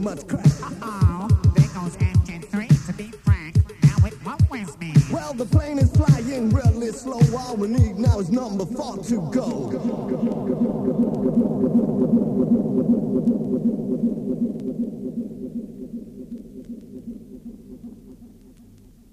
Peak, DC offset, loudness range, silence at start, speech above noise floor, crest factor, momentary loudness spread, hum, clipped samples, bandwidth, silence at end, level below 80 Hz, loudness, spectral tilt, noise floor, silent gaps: -4 dBFS; under 0.1%; 12 LU; 0 s; 27 dB; 16 dB; 18 LU; none; under 0.1%; 12.5 kHz; 0.85 s; -34 dBFS; -22 LUFS; -8 dB/octave; -49 dBFS; none